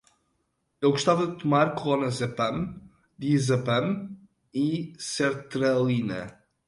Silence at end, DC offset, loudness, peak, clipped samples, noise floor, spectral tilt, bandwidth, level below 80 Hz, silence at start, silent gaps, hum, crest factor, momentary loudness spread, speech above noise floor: 0.35 s; under 0.1%; -26 LUFS; -10 dBFS; under 0.1%; -75 dBFS; -6 dB/octave; 11.5 kHz; -60 dBFS; 0.8 s; none; none; 18 dB; 11 LU; 49 dB